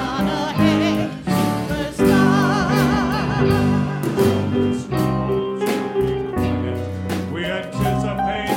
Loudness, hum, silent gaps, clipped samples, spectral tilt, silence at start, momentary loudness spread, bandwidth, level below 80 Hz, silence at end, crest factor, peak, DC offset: -20 LUFS; none; none; under 0.1%; -6.5 dB/octave; 0 s; 7 LU; 16.5 kHz; -38 dBFS; 0 s; 16 dB; -4 dBFS; under 0.1%